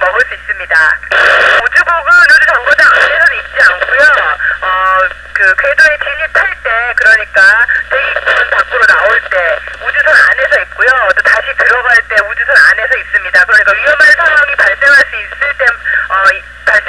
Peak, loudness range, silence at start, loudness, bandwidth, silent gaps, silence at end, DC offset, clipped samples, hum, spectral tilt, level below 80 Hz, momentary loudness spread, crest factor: 0 dBFS; 2 LU; 0 s; -7 LUFS; 11 kHz; none; 0 s; 0.4%; 2%; 60 Hz at -40 dBFS; -1 dB/octave; -38 dBFS; 7 LU; 8 dB